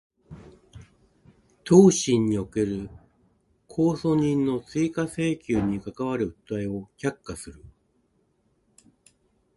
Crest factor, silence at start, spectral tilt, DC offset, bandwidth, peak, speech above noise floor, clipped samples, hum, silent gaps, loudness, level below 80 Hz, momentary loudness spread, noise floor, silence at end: 24 dB; 0.3 s; -6 dB/octave; under 0.1%; 11.5 kHz; -2 dBFS; 45 dB; under 0.1%; none; none; -24 LUFS; -54 dBFS; 19 LU; -68 dBFS; 2.05 s